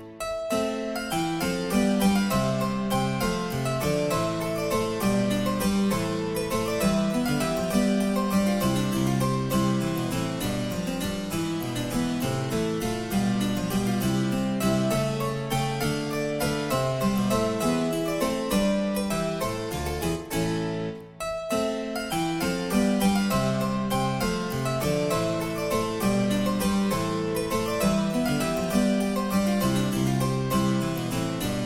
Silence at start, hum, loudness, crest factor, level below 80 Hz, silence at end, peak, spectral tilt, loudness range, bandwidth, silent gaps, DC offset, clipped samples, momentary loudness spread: 0 s; none; -26 LUFS; 14 dB; -44 dBFS; 0 s; -10 dBFS; -5.5 dB/octave; 3 LU; 17 kHz; none; under 0.1%; under 0.1%; 5 LU